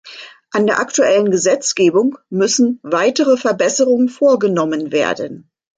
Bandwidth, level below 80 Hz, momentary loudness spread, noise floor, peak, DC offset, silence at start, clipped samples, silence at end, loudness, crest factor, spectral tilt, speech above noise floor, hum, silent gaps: 9.6 kHz; -64 dBFS; 6 LU; -37 dBFS; -2 dBFS; under 0.1%; 0.05 s; under 0.1%; 0.4 s; -15 LUFS; 12 dB; -3.5 dB/octave; 23 dB; none; none